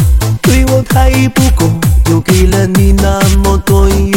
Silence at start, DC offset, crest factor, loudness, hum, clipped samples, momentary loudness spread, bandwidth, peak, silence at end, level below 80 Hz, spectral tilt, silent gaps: 0 s; under 0.1%; 8 dB; -9 LUFS; none; 0.7%; 2 LU; 17 kHz; 0 dBFS; 0 s; -12 dBFS; -5.5 dB/octave; none